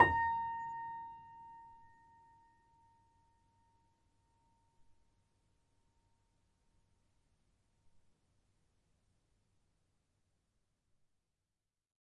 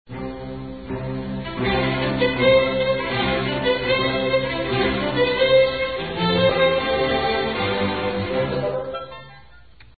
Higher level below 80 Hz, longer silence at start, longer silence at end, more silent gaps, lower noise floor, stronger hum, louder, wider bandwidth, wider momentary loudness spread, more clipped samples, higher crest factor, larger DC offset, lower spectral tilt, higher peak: second, -70 dBFS vs -42 dBFS; about the same, 0 s vs 0.1 s; first, 10.4 s vs 0.6 s; neither; first, under -90 dBFS vs -49 dBFS; neither; second, -37 LUFS vs -21 LUFS; first, 9.4 kHz vs 4.8 kHz; first, 23 LU vs 15 LU; neither; first, 32 dB vs 16 dB; second, under 0.1% vs 0.4%; second, -6.5 dB/octave vs -10.5 dB/octave; second, -12 dBFS vs -6 dBFS